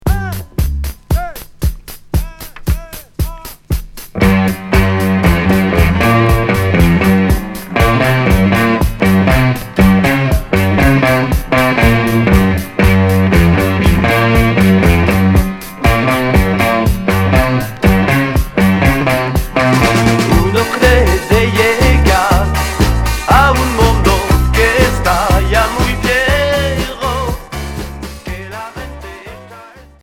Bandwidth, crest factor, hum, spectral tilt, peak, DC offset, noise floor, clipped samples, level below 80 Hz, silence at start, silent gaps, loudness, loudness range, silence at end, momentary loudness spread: 18 kHz; 12 dB; none; -6 dB/octave; 0 dBFS; under 0.1%; -36 dBFS; under 0.1%; -18 dBFS; 0.05 s; none; -12 LUFS; 6 LU; 0.35 s; 12 LU